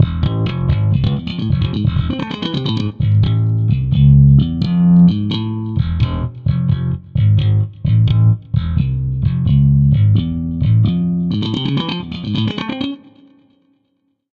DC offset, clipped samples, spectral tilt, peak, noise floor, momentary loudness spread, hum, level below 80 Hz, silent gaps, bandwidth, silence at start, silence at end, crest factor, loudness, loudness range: under 0.1%; under 0.1%; -9.5 dB/octave; 0 dBFS; -66 dBFS; 10 LU; none; -28 dBFS; none; 5 kHz; 0 s; 1.35 s; 14 dB; -15 LUFS; 5 LU